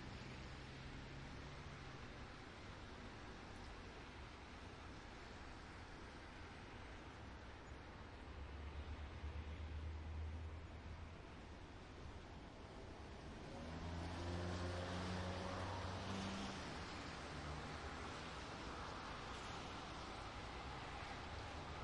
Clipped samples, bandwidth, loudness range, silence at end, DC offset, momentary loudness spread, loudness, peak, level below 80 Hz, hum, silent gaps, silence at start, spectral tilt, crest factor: under 0.1%; 11 kHz; 8 LU; 0 s; under 0.1%; 9 LU; -52 LUFS; -34 dBFS; -58 dBFS; none; none; 0 s; -5 dB/octave; 16 dB